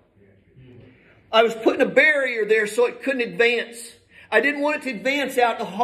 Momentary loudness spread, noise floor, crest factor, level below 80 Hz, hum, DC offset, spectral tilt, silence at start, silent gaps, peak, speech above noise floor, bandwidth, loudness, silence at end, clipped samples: 9 LU; -56 dBFS; 20 dB; -68 dBFS; none; under 0.1%; -3.5 dB/octave; 1.3 s; none; -2 dBFS; 35 dB; 14.5 kHz; -20 LUFS; 0 s; under 0.1%